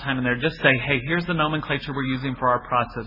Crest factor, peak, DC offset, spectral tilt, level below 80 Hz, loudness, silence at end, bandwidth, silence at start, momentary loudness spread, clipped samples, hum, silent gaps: 20 dB; -4 dBFS; under 0.1%; -8.5 dB/octave; -46 dBFS; -22 LUFS; 0 s; 5.8 kHz; 0 s; 7 LU; under 0.1%; none; none